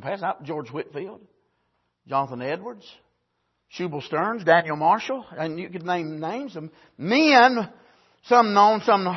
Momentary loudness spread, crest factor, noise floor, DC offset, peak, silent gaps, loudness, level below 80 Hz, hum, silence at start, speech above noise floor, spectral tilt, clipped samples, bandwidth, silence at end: 19 LU; 20 dB; -74 dBFS; under 0.1%; -2 dBFS; none; -22 LUFS; -74 dBFS; none; 0 s; 52 dB; -5 dB/octave; under 0.1%; 6.2 kHz; 0 s